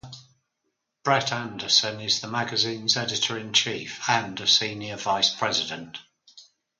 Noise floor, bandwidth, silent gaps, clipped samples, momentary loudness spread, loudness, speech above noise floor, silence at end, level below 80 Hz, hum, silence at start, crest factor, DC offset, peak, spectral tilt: -79 dBFS; 11 kHz; none; under 0.1%; 11 LU; -23 LUFS; 53 dB; 0.35 s; -66 dBFS; none; 0.05 s; 22 dB; under 0.1%; -4 dBFS; -2 dB/octave